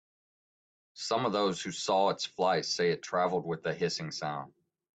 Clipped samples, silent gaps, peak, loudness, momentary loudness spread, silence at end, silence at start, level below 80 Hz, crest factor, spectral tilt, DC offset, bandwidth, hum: under 0.1%; none; -14 dBFS; -31 LUFS; 9 LU; 0.5 s; 0.95 s; -74 dBFS; 18 dB; -4 dB/octave; under 0.1%; 9.2 kHz; none